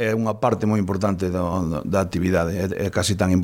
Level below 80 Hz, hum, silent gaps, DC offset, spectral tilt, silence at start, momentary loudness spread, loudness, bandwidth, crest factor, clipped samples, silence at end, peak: -48 dBFS; none; none; under 0.1%; -6 dB/octave; 0 s; 3 LU; -22 LUFS; 16.5 kHz; 16 dB; under 0.1%; 0 s; -6 dBFS